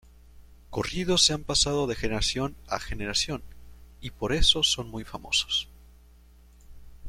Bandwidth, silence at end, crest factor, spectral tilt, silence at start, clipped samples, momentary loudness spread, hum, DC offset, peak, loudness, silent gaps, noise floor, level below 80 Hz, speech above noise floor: 15.5 kHz; 0 s; 22 dB; -2.5 dB/octave; 0.35 s; under 0.1%; 16 LU; none; under 0.1%; -6 dBFS; -26 LUFS; none; -54 dBFS; -40 dBFS; 27 dB